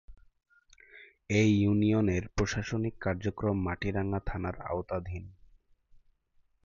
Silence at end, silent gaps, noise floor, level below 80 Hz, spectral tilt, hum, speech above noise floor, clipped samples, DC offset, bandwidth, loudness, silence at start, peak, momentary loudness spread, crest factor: 1.3 s; none; -69 dBFS; -46 dBFS; -6.5 dB/octave; none; 39 dB; under 0.1%; under 0.1%; 7.4 kHz; -31 LUFS; 0.1 s; -14 dBFS; 11 LU; 18 dB